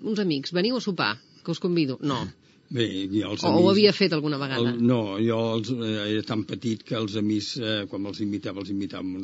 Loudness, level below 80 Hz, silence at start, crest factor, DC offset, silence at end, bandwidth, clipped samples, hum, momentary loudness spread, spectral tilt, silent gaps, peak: -25 LUFS; -68 dBFS; 0 s; 20 dB; under 0.1%; 0 s; 8 kHz; under 0.1%; none; 11 LU; -4.5 dB/octave; none; -4 dBFS